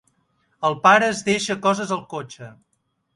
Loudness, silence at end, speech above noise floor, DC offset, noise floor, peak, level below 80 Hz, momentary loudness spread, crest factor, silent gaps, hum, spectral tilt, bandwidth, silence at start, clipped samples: -19 LUFS; 0.65 s; 46 dB; under 0.1%; -67 dBFS; -2 dBFS; -64 dBFS; 18 LU; 20 dB; none; none; -4 dB/octave; 11.5 kHz; 0.6 s; under 0.1%